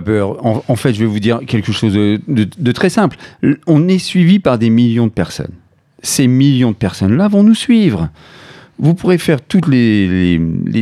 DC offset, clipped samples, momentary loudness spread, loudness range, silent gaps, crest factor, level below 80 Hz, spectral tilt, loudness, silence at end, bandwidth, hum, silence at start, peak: under 0.1%; under 0.1%; 7 LU; 2 LU; none; 12 dB; -42 dBFS; -6.5 dB/octave; -13 LUFS; 0 s; 13.5 kHz; none; 0 s; 0 dBFS